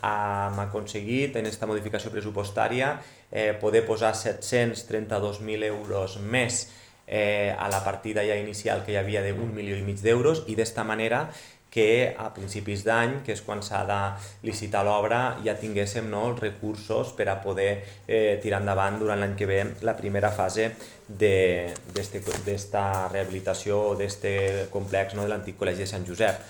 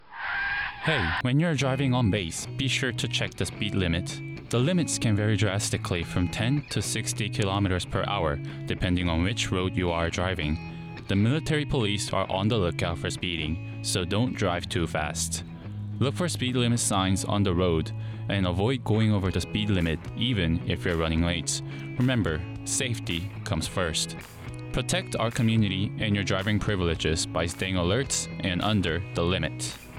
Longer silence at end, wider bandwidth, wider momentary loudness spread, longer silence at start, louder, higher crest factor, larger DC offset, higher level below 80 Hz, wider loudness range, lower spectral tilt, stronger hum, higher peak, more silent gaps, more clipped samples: about the same, 0 s vs 0 s; first, 19 kHz vs 15.5 kHz; about the same, 8 LU vs 7 LU; about the same, 0 s vs 0 s; about the same, -27 LUFS vs -27 LUFS; first, 20 dB vs 14 dB; neither; second, -60 dBFS vs -46 dBFS; about the same, 2 LU vs 2 LU; about the same, -5 dB/octave vs -4.5 dB/octave; neither; first, -8 dBFS vs -12 dBFS; neither; neither